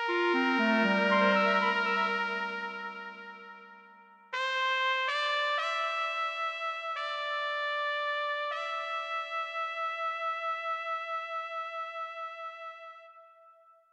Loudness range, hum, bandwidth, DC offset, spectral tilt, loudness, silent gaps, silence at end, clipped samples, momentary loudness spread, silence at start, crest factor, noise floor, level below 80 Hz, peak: 7 LU; none; 9.4 kHz; under 0.1%; -4.5 dB/octave; -30 LUFS; none; 0.4 s; under 0.1%; 15 LU; 0 s; 20 dB; -60 dBFS; -90 dBFS; -12 dBFS